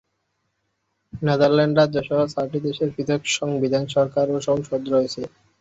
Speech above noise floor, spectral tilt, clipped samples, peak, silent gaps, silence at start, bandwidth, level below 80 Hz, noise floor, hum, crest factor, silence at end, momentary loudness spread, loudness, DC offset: 53 dB; -5.5 dB/octave; under 0.1%; -6 dBFS; none; 1.15 s; 8 kHz; -58 dBFS; -73 dBFS; none; 16 dB; 0.35 s; 9 LU; -21 LUFS; under 0.1%